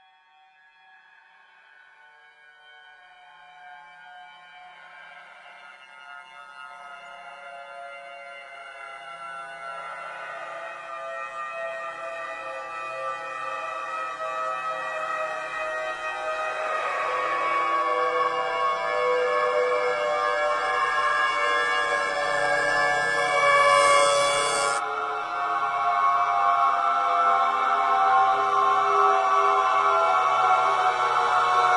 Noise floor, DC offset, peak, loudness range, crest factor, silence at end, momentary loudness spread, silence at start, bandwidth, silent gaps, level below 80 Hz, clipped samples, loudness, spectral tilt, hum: -58 dBFS; under 0.1%; -8 dBFS; 20 LU; 18 dB; 0 s; 20 LU; 2.85 s; 11.5 kHz; none; -64 dBFS; under 0.1%; -23 LUFS; -1 dB/octave; none